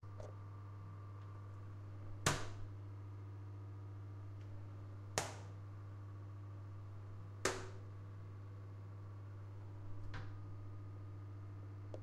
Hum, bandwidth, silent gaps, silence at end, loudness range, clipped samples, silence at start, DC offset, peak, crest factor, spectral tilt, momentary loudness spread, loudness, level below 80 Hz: none; 13 kHz; none; 0 s; 5 LU; under 0.1%; 0 s; under 0.1%; -16 dBFS; 32 dB; -4 dB/octave; 11 LU; -49 LUFS; -62 dBFS